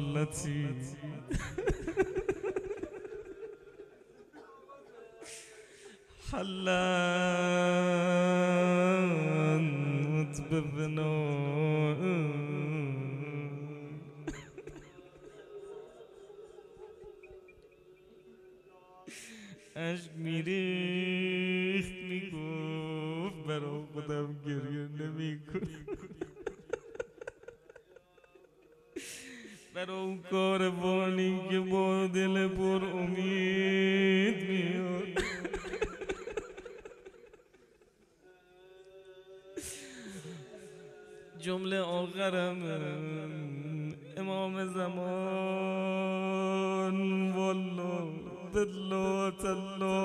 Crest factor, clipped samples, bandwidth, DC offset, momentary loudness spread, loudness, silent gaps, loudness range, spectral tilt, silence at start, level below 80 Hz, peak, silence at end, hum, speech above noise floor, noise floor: 18 dB; under 0.1%; 12.5 kHz; under 0.1%; 23 LU; -33 LUFS; none; 19 LU; -6 dB/octave; 0 s; -56 dBFS; -16 dBFS; 0 s; none; 34 dB; -65 dBFS